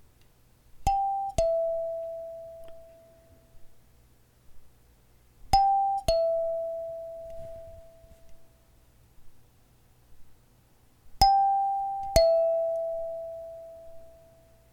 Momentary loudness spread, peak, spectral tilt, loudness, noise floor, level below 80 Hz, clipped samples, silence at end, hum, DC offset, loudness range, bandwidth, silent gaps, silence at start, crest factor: 22 LU; -6 dBFS; -4 dB/octave; -27 LUFS; -60 dBFS; -44 dBFS; under 0.1%; 0.6 s; none; under 0.1%; 16 LU; 17 kHz; none; 0.75 s; 24 dB